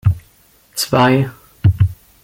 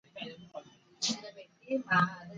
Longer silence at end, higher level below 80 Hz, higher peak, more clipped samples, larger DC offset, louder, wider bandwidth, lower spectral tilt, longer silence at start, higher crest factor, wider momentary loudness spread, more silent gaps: first, 0.3 s vs 0 s; first, -38 dBFS vs -76 dBFS; first, -2 dBFS vs -14 dBFS; neither; neither; first, -16 LUFS vs -32 LUFS; first, 16.5 kHz vs 9.4 kHz; first, -6 dB/octave vs -3.5 dB/octave; about the same, 0.05 s vs 0.15 s; second, 16 dB vs 22 dB; second, 13 LU vs 21 LU; neither